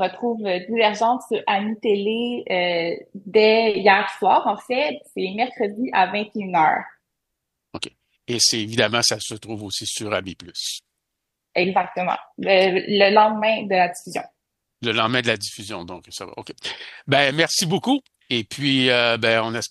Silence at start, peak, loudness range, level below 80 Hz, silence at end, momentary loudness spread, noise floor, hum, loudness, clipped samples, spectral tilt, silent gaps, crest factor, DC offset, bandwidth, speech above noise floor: 0 s; -2 dBFS; 5 LU; -66 dBFS; 0.05 s; 16 LU; -80 dBFS; none; -20 LUFS; under 0.1%; -3 dB/octave; none; 20 dB; under 0.1%; 12.5 kHz; 59 dB